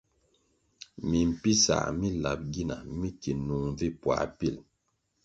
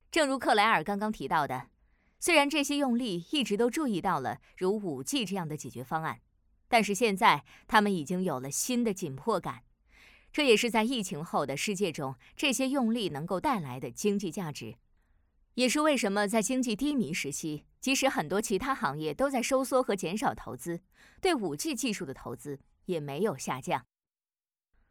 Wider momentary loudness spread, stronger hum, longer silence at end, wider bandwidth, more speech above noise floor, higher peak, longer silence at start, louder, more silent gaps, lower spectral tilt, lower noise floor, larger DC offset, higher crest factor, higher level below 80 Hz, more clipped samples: about the same, 13 LU vs 13 LU; neither; second, 0.65 s vs 1.1 s; second, 8.8 kHz vs 18.5 kHz; second, 48 dB vs over 60 dB; about the same, -10 dBFS vs -8 dBFS; first, 1 s vs 0.1 s; about the same, -29 LUFS vs -30 LUFS; neither; about the same, -4.5 dB/octave vs -4 dB/octave; second, -77 dBFS vs under -90 dBFS; neither; about the same, 20 dB vs 24 dB; first, -48 dBFS vs -62 dBFS; neither